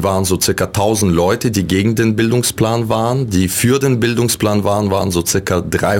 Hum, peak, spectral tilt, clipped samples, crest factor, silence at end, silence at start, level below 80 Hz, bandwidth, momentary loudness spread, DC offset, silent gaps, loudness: none; -2 dBFS; -5 dB/octave; under 0.1%; 12 dB; 0 s; 0 s; -38 dBFS; 17 kHz; 2 LU; under 0.1%; none; -15 LUFS